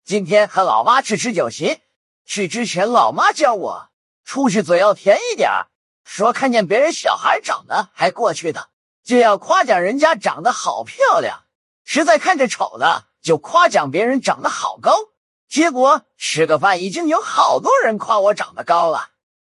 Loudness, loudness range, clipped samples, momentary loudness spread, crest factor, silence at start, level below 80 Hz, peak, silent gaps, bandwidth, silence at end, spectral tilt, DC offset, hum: -16 LUFS; 2 LU; under 0.1%; 9 LU; 16 dB; 0.1 s; -72 dBFS; 0 dBFS; 1.96-2.25 s, 3.93-4.24 s, 5.75-6.05 s, 8.73-9.03 s, 11.55-11.85 s, 15.17-15.48 s; 11.5 kHz; 0.5 s; -3.5 dB/octave; under 0.1%; none